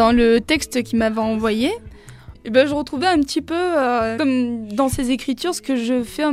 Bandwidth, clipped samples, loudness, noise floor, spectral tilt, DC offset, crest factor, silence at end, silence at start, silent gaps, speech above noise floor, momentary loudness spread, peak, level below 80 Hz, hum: 15.5 kHz; under 0.1%; -19 LUFS; -41 dBFS; -4.5 dB/octave; under 0.1%; 18 dB; 0 s; 0 s; none; 22 dB; 6 LU; -2 dBFS; -40 dBFS; none